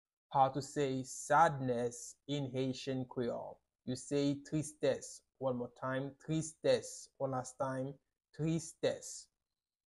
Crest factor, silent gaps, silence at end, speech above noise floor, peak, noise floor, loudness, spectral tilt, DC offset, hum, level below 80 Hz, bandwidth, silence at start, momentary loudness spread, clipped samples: 22 dB; none; 0.65 s; over 53 dB; -14 dBFS; under -90 dBFS; -37 LUFS; -5 dB/octave; under 0.1%; none; -70 dBFS; 12 kHz; 0.3 s; 12 LU; under 0.1%